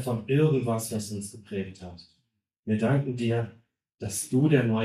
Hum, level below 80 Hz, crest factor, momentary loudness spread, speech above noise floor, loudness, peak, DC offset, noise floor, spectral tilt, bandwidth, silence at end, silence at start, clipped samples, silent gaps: none; -62 dBFS; 18 dB; 16 LU; 50 dB; -27 LUFS; -8 dBFS; under 0.1%; -76 dBFS; -6.5 dB/octave; 14 kHz; 0 s; 0 s; under 0.1%; 2.59-2.63 s